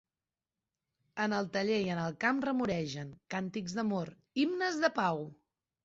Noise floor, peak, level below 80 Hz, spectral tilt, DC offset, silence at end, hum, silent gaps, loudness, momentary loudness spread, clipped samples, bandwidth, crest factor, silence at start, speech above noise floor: under -90 dBFS; -16 dBFS; -70 dBFS; -4 dB/octave; under 0.1%; 0.5 s; none; none; -34 LUFS; 9 LU; under 0.1%; 8 kHz; 20 dB; 1.15 s; over 57 dB